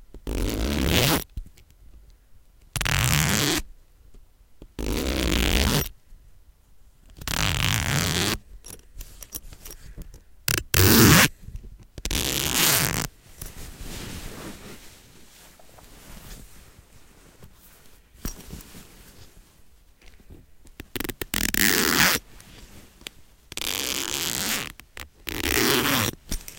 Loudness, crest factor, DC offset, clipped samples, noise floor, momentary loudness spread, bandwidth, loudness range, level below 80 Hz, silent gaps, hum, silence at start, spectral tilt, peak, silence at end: -22 LUFS; 26 dB; under 0.1%; under 0.1%; -53 dBFS; 24 LU; 17.5 kHz; 24 LU; -36 dBFS; none; none; 0 s; -3 dB/octave; 0 dBFS; 0 s